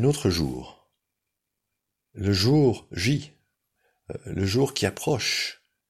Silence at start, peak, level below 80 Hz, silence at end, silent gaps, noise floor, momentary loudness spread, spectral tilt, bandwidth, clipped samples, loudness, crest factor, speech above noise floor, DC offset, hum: 0 s; -8 dBFS; -50 dBFS; 0.35 s; none; -83 dBFS; 12 LU; -5 dB/octave; 15.5 kHz; under 0.1%; -25 LUFS; 20 dB; 58 dB; under 0.1%; none